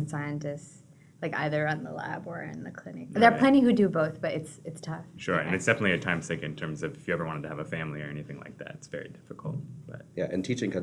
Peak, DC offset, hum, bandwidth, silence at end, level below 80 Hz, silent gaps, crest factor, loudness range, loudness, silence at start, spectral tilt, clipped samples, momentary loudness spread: -6 dBFS; under 0.1%; none; 11.5 kHz; 0 s; -64 dBFS; none; 24 dB; 11 LU; -29 LUFS; 0 s; -6 dB/octave; under 0.1%; 19 LU